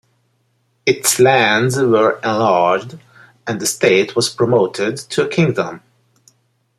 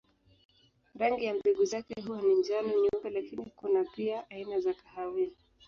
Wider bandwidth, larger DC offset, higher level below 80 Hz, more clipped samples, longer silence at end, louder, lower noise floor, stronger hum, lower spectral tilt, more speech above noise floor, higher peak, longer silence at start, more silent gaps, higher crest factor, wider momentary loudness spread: first, 15.5 kHz vs 7.2 kHz; neither; first, -60 dBFS vs -70 dBFS; neither; first, 1 s vs 0.35 s; first, -15 LUFS vs -32 LUFS; first, -63 dBFS vs -57 dBFS; neither; about the same, -4 dB/octave vs -5 dB/octave; first, 48 dB vs 26 dB; first, 0 dBFS vs -16 dBFS; about the same, 0.85 s vs 0.95 s; neither; about the same, 16 dB vs 16 dB; about the same, 10 LU vs 10 LU